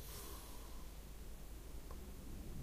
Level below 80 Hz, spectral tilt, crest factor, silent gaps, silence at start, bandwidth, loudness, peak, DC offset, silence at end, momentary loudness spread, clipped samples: -52 dBFS; -4.5 dB/octave; 12 dB; none; 0 s; 15.5 kHz; -54 LUFS; -36 dBFS; under 0.1%; 0 s; 5 LU; under 0.1%